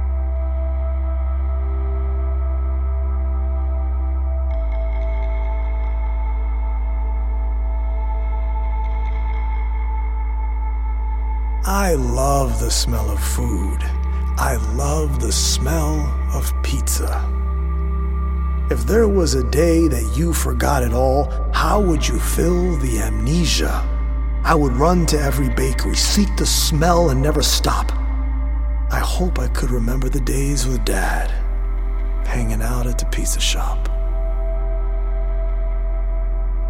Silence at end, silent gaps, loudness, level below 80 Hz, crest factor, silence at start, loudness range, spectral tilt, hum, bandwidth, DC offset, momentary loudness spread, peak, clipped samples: 0 s; none; -20 LUFS; -20 dBFS; 18 dB; 0 s; 6 LU; -5 dB/octave; none; 16.5 kHz; under 0.1%; 8 LU; 0 dBFS; under 0.1%